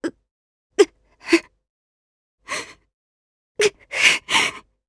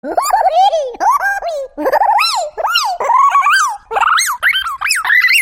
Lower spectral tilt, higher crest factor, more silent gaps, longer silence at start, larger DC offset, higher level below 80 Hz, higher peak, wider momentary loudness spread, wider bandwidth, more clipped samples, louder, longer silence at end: first, -1 dB/octave vs 1 dB/octave; first, 24 dB vs 12 dB; first, 0.31-0.70 s, 1.70-2.38 s, 2.94-3.55 s vs none; about the same, 0 s vs 0.05 s; neither; second, -62 dBFS vs -50 dBFS; about the same, 0 dBFS vs 0 dBFS; first, 18 LU vs 7 LU; second, 11 kHz vs 16.5 kHz; neither; second, -20 LUFS vs -12 LUFS; first, 0.3 s vs 0 s